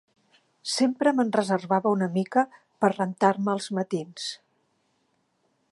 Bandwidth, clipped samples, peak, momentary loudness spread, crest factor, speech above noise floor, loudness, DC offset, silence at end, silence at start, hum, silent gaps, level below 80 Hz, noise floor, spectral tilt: 11.5 kHz; under 0.1%; -8 dBFS; 11 LU; 20 dB; 47 dB; -26 LUFS; under 0.1%; 1.35 s; 0.65 s; none; none; -78 dBFS; -71 dBFS; -5 dB/octave